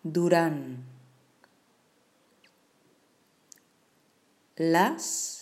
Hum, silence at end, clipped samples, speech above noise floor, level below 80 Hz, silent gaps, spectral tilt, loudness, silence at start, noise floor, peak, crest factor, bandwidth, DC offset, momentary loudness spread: none; 0 s; under 0.1%; 41 dB; -86 dBFS; none; -4.5 dB/octave; -26 LUFS; 0.05 s; -67 dBFS; -10 dBFS; 22 dB; 15.5 kHz; under 0.1%; 22 LU